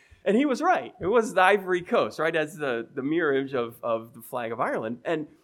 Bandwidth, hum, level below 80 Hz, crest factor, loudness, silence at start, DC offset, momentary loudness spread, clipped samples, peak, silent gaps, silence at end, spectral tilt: 18 kHz; none; -66 dBFS; 20 dB; -26 LUFS; 0.25 s; under 0.1%; 10 LU; under 0.1%; -6 dBFS; none; 0.15 s; -5.5 dB/octave